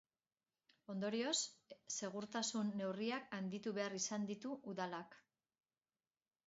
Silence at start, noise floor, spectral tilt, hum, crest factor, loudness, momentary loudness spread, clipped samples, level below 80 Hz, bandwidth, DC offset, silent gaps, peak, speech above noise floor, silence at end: 0.9 s; under -90 dBFS; -3.5 dB/octave; none; 20 dB; -43 LUFS; 9 LU; under 0.1%; -88 dBFS; 7.6 kHz; under 0.1%; none; -26 dBFS; over 46 dB; 1.3 s